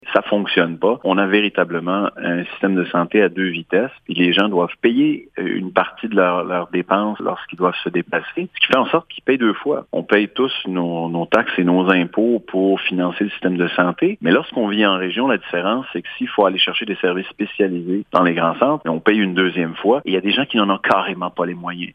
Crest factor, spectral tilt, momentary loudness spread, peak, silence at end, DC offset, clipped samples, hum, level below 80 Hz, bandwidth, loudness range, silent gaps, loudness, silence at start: 18 dB; -7.5 dB/octave; 7 LU; 0 dBFS; 0.05 s; under 0.1%; under 0.1%; none; -62 dBFS; 6.6 kHz; 2 LU; none; -18 LUFS; 0.05 s